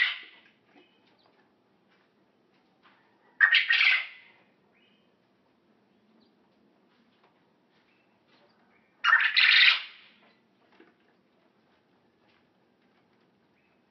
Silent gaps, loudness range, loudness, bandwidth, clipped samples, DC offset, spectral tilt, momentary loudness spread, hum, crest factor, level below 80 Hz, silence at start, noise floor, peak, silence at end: none; 6 LU; -21 LUFS; 6.2 kHz; under 0.1%; under 0.1%; 7 dB/octave; 19 LU; none; 24 dB; -86 dBFS; 0 s; -68 dBFS; -6 dBFS; 4.05 s